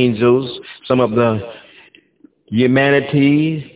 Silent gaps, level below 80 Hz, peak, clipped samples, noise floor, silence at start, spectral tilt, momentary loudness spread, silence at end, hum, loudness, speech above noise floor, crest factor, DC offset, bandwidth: none; -52 dBFS; 0 dBFS; under 0.1%; -51 dBFS; 0 s; -11 dB/octave; 12 LU; 0.1 s; none; -15 LUFS; 36 dB; 16 dB; under 0.1%; 4 kHz